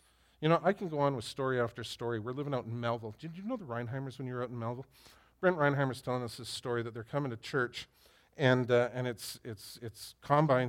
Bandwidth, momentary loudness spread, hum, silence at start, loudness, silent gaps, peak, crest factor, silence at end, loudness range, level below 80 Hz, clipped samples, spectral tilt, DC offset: 16.5 kHz; 16 LU; none; 0.4 s; -34 LUFS; none; -12 dBFS; 22 dB; 0 s; 4 LU; -68 dBFS; under 0.1%; -6 dB/octave; under 0.1%